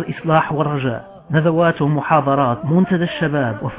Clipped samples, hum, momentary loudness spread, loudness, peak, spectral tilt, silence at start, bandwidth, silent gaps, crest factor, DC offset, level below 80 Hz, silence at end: under 0.1%; none; 5 LU; -17 LUFS; -2 dBFS; -11.5 dB/octave; 0 s; 4 kHz; none; 14 dB; under 0.1%; -50 dBFS; 0 s